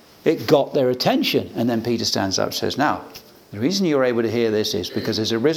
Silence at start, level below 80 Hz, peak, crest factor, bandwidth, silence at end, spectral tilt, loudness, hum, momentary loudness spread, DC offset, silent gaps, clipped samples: 0.25 s; -64 dBFS; -2 dBFS; 20 dB; 18.5 kHz; 0 s; -4.5 dB/octave; -20 LUFS; none; 6 LU; under 0.1%; none; under 0.1%